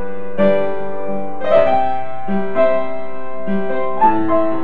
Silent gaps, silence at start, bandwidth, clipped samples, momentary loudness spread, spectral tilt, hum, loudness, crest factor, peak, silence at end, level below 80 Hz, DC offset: none; 0 s; 5 kHz; under 0.1%; 12 LU; -9 dB/octave; none; -18 LUFS; 16 dB; 0 dBFS; 0 s; -54 dBFS; 20%